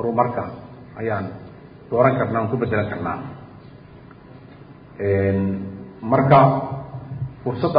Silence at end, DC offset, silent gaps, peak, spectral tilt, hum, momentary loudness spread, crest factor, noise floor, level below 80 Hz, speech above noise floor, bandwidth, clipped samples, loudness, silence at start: 0 s; under 0.1%; none; 0 dBFS; -12.5 dB/octave; none; 24 LU; 20 dB; -43 dBFS; -46 dBFS; 24 dB; 5.2 kHz; under 0.1%; -21 LUFS; 0 s